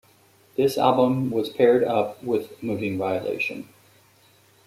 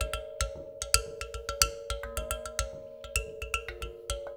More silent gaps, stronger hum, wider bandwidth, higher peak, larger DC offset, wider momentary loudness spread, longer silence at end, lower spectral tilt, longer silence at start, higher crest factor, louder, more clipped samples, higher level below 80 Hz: neither; neither; second, 15.5 kHz vs over 20 kHz; about the same, -4 dBFS vs -4 dBFS; neither; second, 9 LU vs 12 LU; first, 1.05 s vs 0 s; first, -6.5 dB/octave vs -1.5 dB/octave; first, 0.6 s vs 0 s; second, 20 dB vs 32 dB; first, -23 LUFS vs -33 LUFS; neither; second, -66 dBFS vs -40 dBFS